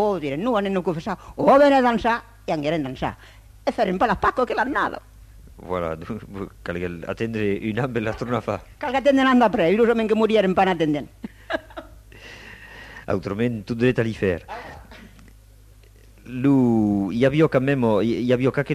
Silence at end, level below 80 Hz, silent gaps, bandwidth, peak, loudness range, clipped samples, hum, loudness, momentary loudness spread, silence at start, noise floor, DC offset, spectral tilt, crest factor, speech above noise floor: 0 s; -46 dBFS; none; 14 kHz; -4 dBFS; 7 LU; under 0.1%; none; -21 LUFS; 19 LU; 0 s; -49 dBFS; under 0.1%; -7 dB/octave; 18 dB; 28 dB